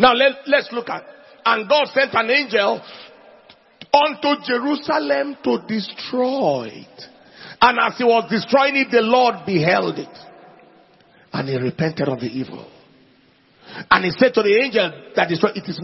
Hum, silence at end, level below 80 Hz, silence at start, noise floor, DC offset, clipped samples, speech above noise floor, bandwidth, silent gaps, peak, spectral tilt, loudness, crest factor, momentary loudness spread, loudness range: none; 0 s; -60 dBFS; 0 s; -55 dBFS; under 0.1%; under 0.1%; 36 dB; 6 kHz; none; 0 dBFS; -6 dB/octave; -18 LUFS; 20 dB; 14 LU; 7 LU